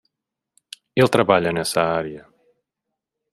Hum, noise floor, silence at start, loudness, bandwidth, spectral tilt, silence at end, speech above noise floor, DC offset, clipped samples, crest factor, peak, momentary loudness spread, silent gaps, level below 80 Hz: none; -84 dBFS; 0.95 s; -19 LUFS; 14.5 kHz; -5 dB/octave; 1.15 s; 65 dB; under 0.1%; under 0.1%; 20 dB; -2 dBFS; 24 LU; none; -58 dBFS